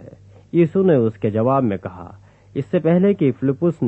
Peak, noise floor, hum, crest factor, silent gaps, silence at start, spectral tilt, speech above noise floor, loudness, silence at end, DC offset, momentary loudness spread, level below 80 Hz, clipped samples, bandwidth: -4 dBFS; -43 dBFS; none; 14 dB; none; 0 s; -10.5 dB/octave; 25 dB; -18 LUFS; 0 s; under 0.1%; 13 LU; -56 dBFS; under 0.1%; 4 kHz